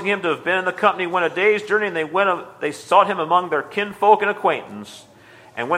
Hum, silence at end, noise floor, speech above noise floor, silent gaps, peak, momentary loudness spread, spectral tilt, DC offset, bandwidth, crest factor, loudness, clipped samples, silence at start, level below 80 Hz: none; 0 s; -41 dBFS; 22 dB; none; 0 dBFS; 11 LU; -4.5 dB/octave; under 0.1%; 14.5 kHz; 20 dB; -19 LUFS; under 0.1%; 0 s; -70 dBFS